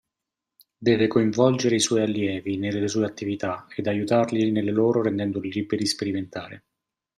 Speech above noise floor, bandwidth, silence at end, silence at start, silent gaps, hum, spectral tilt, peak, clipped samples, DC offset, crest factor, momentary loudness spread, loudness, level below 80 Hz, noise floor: 63 dB; 13 kHz; 0.6 s; 0.8 s; none; none; -5 dB/octave; -6 dBFS; under 0.1%; under 0.1%; 18 dB; 9 LU; -24 LUFS; -64 dBFS; -86 dBFS